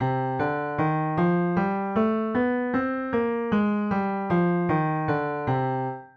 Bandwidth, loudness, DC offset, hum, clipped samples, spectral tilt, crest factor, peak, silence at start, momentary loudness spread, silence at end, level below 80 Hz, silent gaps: 5.2 kHz; -25 LUFS; under 0.1%; none; under 0.1%; -10 dB/octave; 14 dB; -12 dBFS; 0 s; 3 LU; 0.1 s; -56 dBFS; none